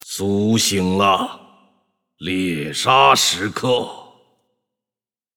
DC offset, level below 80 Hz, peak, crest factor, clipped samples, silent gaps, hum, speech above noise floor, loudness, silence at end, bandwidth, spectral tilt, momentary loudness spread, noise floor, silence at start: under 0.1%; -58 dBFS; -2 dBFS; 18 dB; under 0.1%; none; none; over 73 dB; -17 LUFS; 1.3 s; 19 kHz; -3.5 dB/octave; 12 LU; under -90 dBFS; 0.05 s